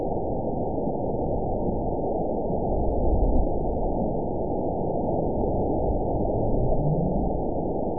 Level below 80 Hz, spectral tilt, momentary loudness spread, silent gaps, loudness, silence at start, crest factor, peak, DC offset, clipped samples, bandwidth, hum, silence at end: -30 dBFS; -18.5 dB/octave; 3 LU; none; -27 LUFS; 0 s; 14 dB; -10 dBFS; 2%; under 0.1%; 1 kHz; none; 0 s